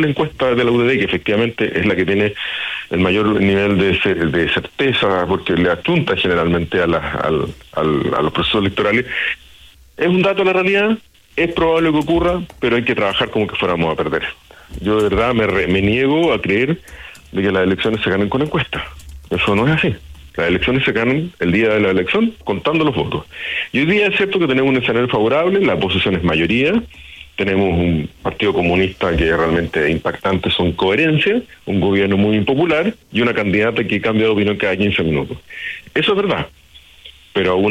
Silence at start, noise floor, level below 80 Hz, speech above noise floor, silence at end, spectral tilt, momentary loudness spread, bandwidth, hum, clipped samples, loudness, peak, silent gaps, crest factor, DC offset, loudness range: 0 s; -44 dBFS; -40 dBFS; 28 dB; 0 s; -7 dB/octave; 7 LU; 14.5 kHz; none; under 0.1%; -16 LUFS; -4 dBFS; none; 12 dB; under 0.1%; 2 LU